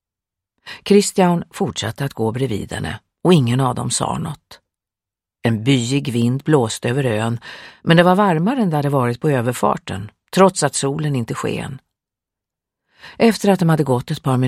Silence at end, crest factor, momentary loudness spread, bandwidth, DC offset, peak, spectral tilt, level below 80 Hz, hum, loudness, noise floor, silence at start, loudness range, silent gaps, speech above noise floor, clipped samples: 0 s; 18 dB; 13 LU; 15.5 kHz; under 0.1%; 0 dBFS; -5.5 dB/octave; -52 dBFS; none; -18 LUFS; -88 dBFS; 0.65 s; 4 LU; none; 71 dB; under 0.1%